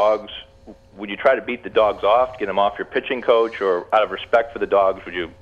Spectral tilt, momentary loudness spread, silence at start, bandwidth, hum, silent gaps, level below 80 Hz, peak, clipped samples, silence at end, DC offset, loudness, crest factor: -5.5 dB/octave; 10 LU; 0 s; 7.2 kHz; none; none; -52 dBFS; -4 dBFS; under 0.1%; 0.1 s; under 0.1%; -20 LUFS; 16 dB